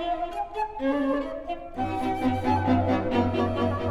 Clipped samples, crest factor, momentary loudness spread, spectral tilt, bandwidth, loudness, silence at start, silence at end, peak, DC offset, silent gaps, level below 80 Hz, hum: under 0.1%; 14 dB; 8 LU; -8 dB/octave; 12 kHz; -27 LUFS; 0 s; 0 s; -12 dBFS; under 0.1%; none; -44 dBFS; none